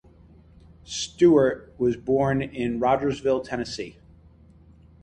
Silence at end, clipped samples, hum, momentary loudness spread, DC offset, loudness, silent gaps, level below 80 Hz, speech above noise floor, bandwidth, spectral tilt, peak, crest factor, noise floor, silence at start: 1.1 s; under 0.1%; none; 14 LU; under 0.1%; -24 LUFS; none; -52 dBFS; 29 dB; 9.4 kHz; -5.5 dB/octave; -8 dBFS; 18 dB; -52 dBFS; 0.9 s